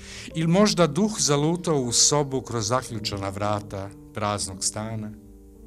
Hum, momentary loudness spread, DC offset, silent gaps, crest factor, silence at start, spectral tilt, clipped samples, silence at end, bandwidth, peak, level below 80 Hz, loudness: none; 15 LU; under 0.1%; none; 22 dB; 0 s; -4 dB/octave; under 0.1%; 0 s; 14.5 kHz; -4 dBFS; -50 dBFS; -23 LUFS